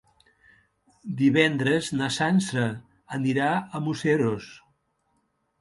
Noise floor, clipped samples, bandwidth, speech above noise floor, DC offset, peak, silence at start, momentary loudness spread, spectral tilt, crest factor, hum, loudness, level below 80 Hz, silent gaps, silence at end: -72 dBFS; under 0.1%; 11.5 kHz; 48 dB; under 0.1%; -6 dBFS; 1.05 s; 15 LU; -5.5 dB/octave; 20 dB; none; -25 LUFS; -64 dBFS; none; 1.05 s